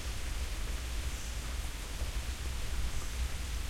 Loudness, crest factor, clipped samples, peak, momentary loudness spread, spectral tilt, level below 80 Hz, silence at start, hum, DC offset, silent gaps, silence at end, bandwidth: -39 LUFS; 12 dB; under 0.1%; -24 dBFS; 2 LU; -3.5 dB/octave; -38 dBFS; 0 s; none; under 0.1%; none; 0 s; 16.5 kHz